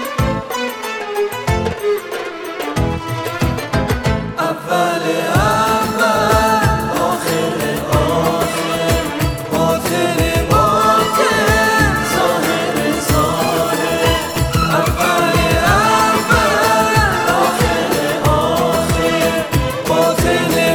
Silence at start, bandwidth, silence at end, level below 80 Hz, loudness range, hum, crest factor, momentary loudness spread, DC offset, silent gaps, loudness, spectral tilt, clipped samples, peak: 0 s; over 20 kHz; 0 s; -28 dBFS; 6 LU; none; 14 dB; 7 LU; under 0.1%; none; -15 LUFS; -4.5 dB/octave; under 0.1%; 0 dBFS